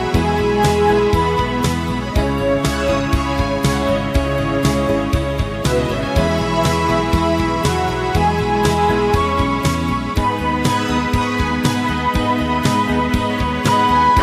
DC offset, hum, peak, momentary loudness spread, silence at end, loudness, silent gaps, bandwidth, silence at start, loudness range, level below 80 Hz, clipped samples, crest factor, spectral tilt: under 0.1%; none; 0 dBFS; 4 LU; 0 s; -17 LUFS; none; 15.5 kHz; 0 s; 1 LU; -26 dBFS; under 0.1%; 16 dB; -5.5 dB/octave